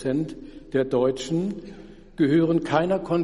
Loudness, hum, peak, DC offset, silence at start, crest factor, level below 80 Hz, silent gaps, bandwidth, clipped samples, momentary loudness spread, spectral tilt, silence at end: -24 LUFS; none; -8 dBFS; under 0.1%; 0 s; 16 dB; -50 dBFS; none; 11.5 kHz; under 0.1%; 18 LU; -7 dB/octave; 0 s